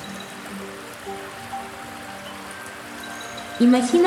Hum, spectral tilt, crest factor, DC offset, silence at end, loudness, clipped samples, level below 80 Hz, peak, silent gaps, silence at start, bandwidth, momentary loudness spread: none; -4 dB/octave; 18 dB; under 0.1%; 0 s; -27 LUFS; under 0.1%; -62 dBFS; -6 dBFS; none; 0 s; 15.5 kHz; 17 LU